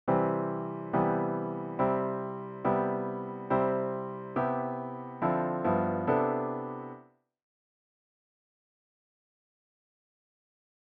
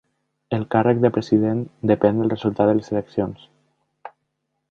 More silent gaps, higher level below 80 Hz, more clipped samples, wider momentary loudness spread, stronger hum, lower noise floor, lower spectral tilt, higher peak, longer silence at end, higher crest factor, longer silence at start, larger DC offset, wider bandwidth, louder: neither; second, -68 dBFS vs -54 dBFS; neither; about the same, 10 LU vs 8 LU; neither; second, -56 dBFS vs -75 dBFS; about the same, -8 dB/octave vs -9 dB/octave; second, -14 dBFS vs -2 dBFS; first, 3.85 s vs 0.65 s; about the same, 18 dB vs 20 dB; second, 0.05 s vs 0.5 s; neither; second, 4.5 kHz vs 7 kHz; second, -31 LUFS vs -21 LUFS